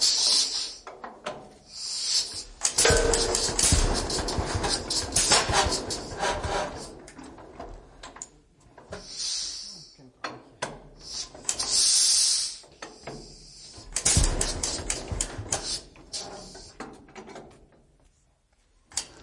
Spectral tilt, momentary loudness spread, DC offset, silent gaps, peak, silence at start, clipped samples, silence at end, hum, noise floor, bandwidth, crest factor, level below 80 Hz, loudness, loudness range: -1.5 dB/octave; 24 LU; under 0.1%; none; -6 dBFS; 0 s; under 0.1%; 0 s; none; -66 dBFS; 11.5 kHz; 22 dB; -38 dBFS; -24 LUFS; 13 LU